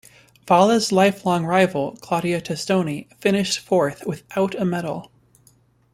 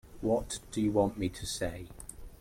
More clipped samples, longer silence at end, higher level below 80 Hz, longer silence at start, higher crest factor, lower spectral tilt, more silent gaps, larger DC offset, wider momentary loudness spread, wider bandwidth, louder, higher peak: neither; first, 0.9 s vs 0.05 s; second, -60 dBFS vs -50 dBFS; first, 0.45 s vs 0.05 s; about the same, 18 dB vs 20 dB; about the same, -5 dB/octave vs -5 dB/octave; neither; neither; second, 11 LU vs 17 LU; about the same, 16 kHz vs 16.5 kHz; first, -21 LUFS vs -33 LUFS; first, -2 dBFS vs -14 dBFS